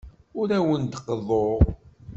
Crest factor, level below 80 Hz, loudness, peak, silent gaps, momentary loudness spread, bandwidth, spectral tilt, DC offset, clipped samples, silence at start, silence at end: 22 dB; -34 dBFS; -24 LUFS; -4 dBFS; none; 11 LU; 7.8 kHz; -8 dB/octave; under 0.1%; under 0.1%; 0.05 s; 0 s